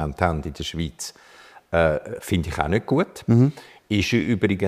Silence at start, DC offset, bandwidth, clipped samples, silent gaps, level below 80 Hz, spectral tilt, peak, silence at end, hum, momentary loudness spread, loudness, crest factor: 0 s; under 0.1%; 15.5 kHz; under 0.1%; none; -40 dBFS; -6 dB/octave; -2 dBFS; 0 s; none; 11 LU; -23 LUFS; 20 dB